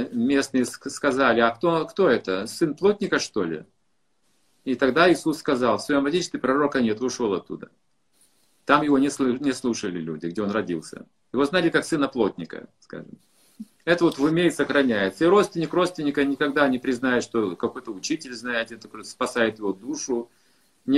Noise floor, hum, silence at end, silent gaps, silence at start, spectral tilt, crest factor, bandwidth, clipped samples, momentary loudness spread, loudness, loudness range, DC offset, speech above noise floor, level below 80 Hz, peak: -74 dBFS; none; 0 s; none; 0 s; -4.5 dB/octave; 22 dB; 13 kHz; under 0.1%; 13 LU; -23 LUFS; 4 LU; under 0.1%; 50 dB; -60 dBFS; -2 dBFS